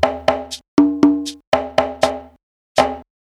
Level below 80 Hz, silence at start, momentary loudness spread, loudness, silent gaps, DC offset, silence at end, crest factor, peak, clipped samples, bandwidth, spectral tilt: -46 dBFS; 0 s; 8 LU; -18 LUFS; 0.68-0.77 s, 1.47-1.52 s, 2.43-2.75 s; under 0.1%; 0.3 s; 18 dB; 0 dBFS; under 0.1%; 13 kHz; -4.5 dB/octave